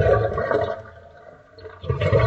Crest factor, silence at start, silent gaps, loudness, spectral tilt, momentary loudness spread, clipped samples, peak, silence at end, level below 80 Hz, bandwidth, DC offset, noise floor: 16 dB; 0 s; none; -23 LUFS; -8 dB/octave; 23 LU; under 0.1%; -6 dBFS; 0 s; -38 dBFS; 7.8 kHz; under 0.1%; -46 dBFS